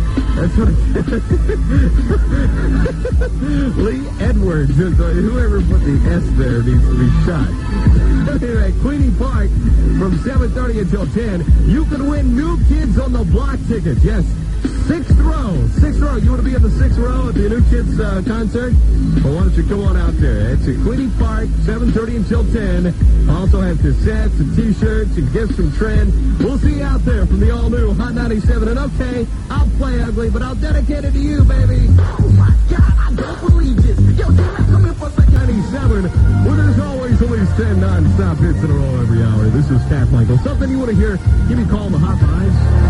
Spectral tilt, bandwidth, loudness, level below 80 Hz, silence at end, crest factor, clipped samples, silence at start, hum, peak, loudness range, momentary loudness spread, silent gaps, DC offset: -8.5 dB/octave; 10.5 kHz; -15 LUFS; -16 dBFS; 0 s; 12 dB; under 0.1%; 0 s; none; 0 dBFS; 3 LU; 5 LU; none; under 0.1%